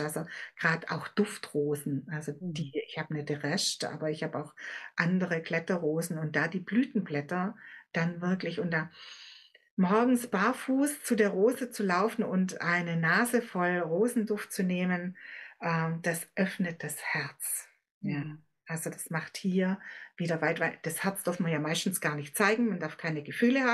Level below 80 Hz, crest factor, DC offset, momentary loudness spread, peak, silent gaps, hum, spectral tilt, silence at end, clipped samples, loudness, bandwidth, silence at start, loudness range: -88 dBFS; 22 dB; under 0.1%; 10 LU; -8 dBFS; 9.71-9.77 s, 17.91-18.01 s; none; -5 dB/octave; 0 s; under 0.1%; -31 LUFS; 12.5 kHz; 0 s; 6 LU